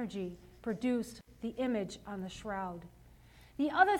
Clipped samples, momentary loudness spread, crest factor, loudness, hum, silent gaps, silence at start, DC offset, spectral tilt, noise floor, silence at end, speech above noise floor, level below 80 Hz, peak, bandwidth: under 0.1%; 11 LU; 24 dB; -37 LUFS; none; none; 0 s; under 0.1%; -5.5 dB/octave; -59 dBFS; 0 s; 24 dB; -62 dBFS; -12 dBFS; 16 kHz